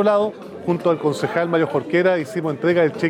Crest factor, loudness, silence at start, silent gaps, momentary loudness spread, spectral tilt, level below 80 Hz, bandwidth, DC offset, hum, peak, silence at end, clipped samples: 12 dB; -20 LUFS; 0 s; none; 7 LU; -7 dB/octave; -70 dBFS; 13 kHz; under 0.1%; none; -6 dBFS; 0 s; under 0.1%